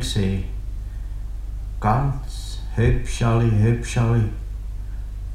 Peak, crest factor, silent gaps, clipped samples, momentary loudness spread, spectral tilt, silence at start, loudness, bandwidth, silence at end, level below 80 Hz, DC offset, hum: -4 dBFS; 18 dB; none; under 0.1%; 15 LU; -6.5 dB/octave; 0 s; -23 LUFS; 12.5 kHz; 0 s; -28 dBFS; under 0.1%; none